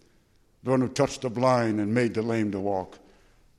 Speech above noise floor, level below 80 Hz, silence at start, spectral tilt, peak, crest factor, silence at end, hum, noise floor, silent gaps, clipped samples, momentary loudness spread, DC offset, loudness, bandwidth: 37 dB; -60 dBFS; 0.65 s; -6.5 dB/octave; -8 dBFS; 18 dB; 0.6 s; none; -62 dBFS; none; under 0.1%; 8 LU; under 0.1%; -26 LUFS; 12.5 kHz